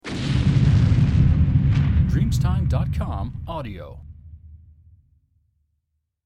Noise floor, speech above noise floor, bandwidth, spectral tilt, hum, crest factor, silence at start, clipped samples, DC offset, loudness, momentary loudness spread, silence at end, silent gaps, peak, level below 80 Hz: -75 dBFS; 51 dB; 9.4 kHz; -8 dB/octave; none; 14 dB; 0.05 s; under 0.1%; under 0.1%; -20 LUFS; 14 LU; 1.7 s; none; -6 dBFS; -28 dBFS